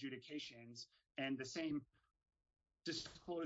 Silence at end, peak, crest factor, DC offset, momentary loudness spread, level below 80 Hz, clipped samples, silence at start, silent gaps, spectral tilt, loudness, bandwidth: 0 s; -32 dBFS; 16 dB; under 0.1%; 11 LU; -80 dBFS; under 0.1%; 0 s; none; -3 dB/octave; -48 LUFS; 7.6 kHz